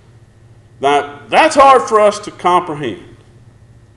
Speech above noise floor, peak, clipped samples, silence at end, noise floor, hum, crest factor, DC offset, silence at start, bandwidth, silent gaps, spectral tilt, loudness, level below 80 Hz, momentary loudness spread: 32 dB; 0 dBFS; under 0.1%; 0.95 s; -44 dBFS; none; 14 dB; under 0.1%; 0.8 s; 12 kHz; none; -3.5 dB/octave; -12 LUFS; -50 dBFS; 15 LU